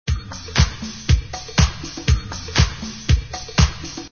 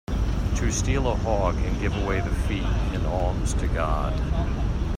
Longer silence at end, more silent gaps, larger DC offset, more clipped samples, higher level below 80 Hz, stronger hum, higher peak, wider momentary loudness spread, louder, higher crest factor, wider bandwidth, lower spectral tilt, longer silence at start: about the same, 0.05 s vs 0 s; neither; first, 0.2% vs under 0.1%; neither; about the same, -24 dBFS vs -26 dBFS; neither; first, 0 dBFS vs -8 dBFS; first, 8 LU vs 3 LU; first, -21 LUFS vs -26 LUFS; first, 20 dB vs 14 dB; second, 7 kHz vs 11.5 kHz; second, -4.5 dB/octave vs -6 dB/octave; about the same, 0.05 s vs 0.1 s